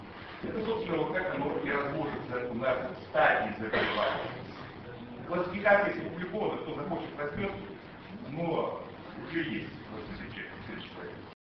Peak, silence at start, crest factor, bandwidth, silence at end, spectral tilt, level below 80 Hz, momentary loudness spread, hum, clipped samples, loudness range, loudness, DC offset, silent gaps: -10 dBFS; 0 s; 22 dB; 6.2 kHz; 0.1 s; -3.5 dB/octave; -58 dBFS; 18 LU; none; under 0.1%; 7 LU; -32 LUFS; under 0.1%; none